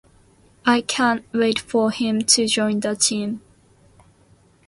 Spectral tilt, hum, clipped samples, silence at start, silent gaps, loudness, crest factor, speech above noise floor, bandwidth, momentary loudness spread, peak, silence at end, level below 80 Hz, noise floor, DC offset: -2.5 dB/octave; none; under 0.1%; 0.65 s; none; -20 LUFS; 20 dB; 35 dB; 11.5 kHz; 8 LU; -2 dBFS; 1.3 s; -60 dBFS; -55 dBFS; under 0.1%